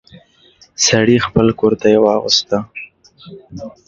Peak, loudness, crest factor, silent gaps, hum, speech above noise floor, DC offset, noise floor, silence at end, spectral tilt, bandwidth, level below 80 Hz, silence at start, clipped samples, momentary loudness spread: 0 dBFS; -13 LUFS; 16 dB; none; none; 35 dB; under 0.1%; -49 dBFS; 0.2 s; -4 dB/octave; 7.8 kHz; -44 dBFS; 0.15 s; under 0.1%; 20 LU